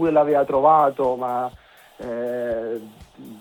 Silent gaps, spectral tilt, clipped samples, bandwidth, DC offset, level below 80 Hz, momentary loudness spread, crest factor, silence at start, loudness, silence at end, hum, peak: none; -7.5 dB/octave; under 0.1%; 18.5 kHz; under 0.1%; -56 dBFS; 15 LU; 18 dB; 0 s; -21 LUFS; 0 s; none; -4 dBFS